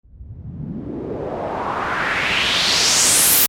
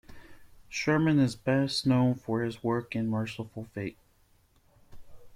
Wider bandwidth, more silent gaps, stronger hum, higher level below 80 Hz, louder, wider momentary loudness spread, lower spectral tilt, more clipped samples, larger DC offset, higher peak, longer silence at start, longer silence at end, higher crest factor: first, 17.5 kHz vs 14.5 kHz; neither; neither; first, -44 dBFS vs -58 dBFS; first, -16 LUFS vs -29 LUFS; first, 19 LU vs 13 LU; second, -0.5 dB/octave vs -6.5 dB/octave; neither; neither; first, -2 dBFS vs -14 dBFS; about the same, 0.15 s vs 0.1 s; about the same, 0 s vs 0 s; about the same, 18 dB vs 18 dB